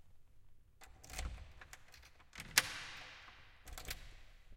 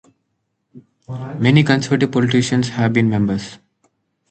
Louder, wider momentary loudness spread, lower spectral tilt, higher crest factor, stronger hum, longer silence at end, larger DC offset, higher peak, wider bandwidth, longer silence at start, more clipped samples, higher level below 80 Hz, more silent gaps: second, -40 LUFS vs -16 LUFS; first, 26 LU vs 16 LU; second, -0.5 dB/octave vs -6 dB/octave; first, 38 dB vs 18 dB; neither; second, 0 s vs 0.75 s; neither; second, -8 dBFS vs 0 dBFS; first, 16.5 kHz vs 9 kHz; second, 0 s vs 0.75 s; neither; about the same, -56 dBFS vs -52 dBFS; neither